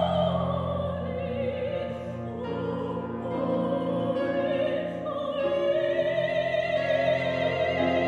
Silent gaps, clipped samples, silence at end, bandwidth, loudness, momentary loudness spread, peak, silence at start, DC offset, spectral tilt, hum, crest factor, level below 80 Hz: none; under 0.1%; 0 s; 8.4 kHz; -28 LUFS; 7 LU; -12 dBFS; 0 s; under 0.1%; -7.5 dB/octave; none; 14 dB; -54 dBFS